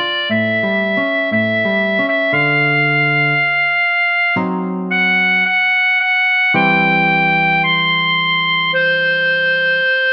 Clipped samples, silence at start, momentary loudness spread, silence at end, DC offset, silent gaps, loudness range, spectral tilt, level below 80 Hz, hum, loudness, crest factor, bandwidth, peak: under 0.1%; 0 s; 4 LU; 0 s; under 0.1%; none; 2 LU; -7 dB/octave; -68 dBFS; none; -13 LUFS; 12 dB; 6.2 kHz; -2 dBFS